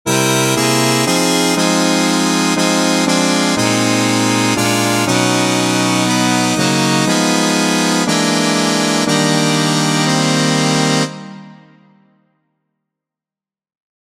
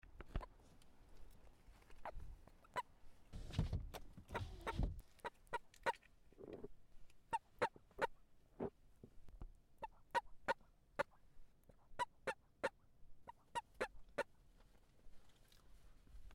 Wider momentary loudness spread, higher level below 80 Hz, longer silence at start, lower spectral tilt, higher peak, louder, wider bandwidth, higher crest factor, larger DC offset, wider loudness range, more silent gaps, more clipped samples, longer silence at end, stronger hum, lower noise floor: second, 1 LU vs 21 LU; about the same, -56 dBFS vs -56 dBFS; about the same, 0.05 s vs 0.05 s; second, -3.5 dB/octave vs -5.5 dB/octave; first, 0 dBFS vs -24 dBFS; first, -13 LUFS vs -48 LUFS; about the same, 16.5 kHz vs 16 kHz; second, 14 dB vs 26 dB; neither; about the same, 4 LU vs 5 LU; neither; neither; first, 2.5 s vs 0 s; neither; first, under -90 dBFS vs -68 dBFS